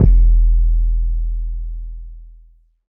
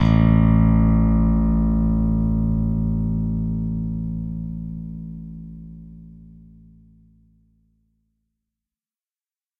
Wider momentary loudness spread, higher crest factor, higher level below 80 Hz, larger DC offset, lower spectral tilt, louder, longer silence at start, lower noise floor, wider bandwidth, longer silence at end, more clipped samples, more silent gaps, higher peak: about the same, 20 LU vs 21 LU; about the same, 14 dB vs 16 dB; first, -16 dBFS vs -28 dBFS; neither; first, -13.5 dB/octave vs -11 dB/octave; about the same, -19 LUFS vs -20 LUFS; about the same, 0 s vs 0 s; second, -48 dBFS vs under -90 dBFS; second, 0.9 kHz vs 4.9 kHz; second, 0.7 s vs 3.45 s; neither; neither; first, 0 dBFS vs -6 dBFS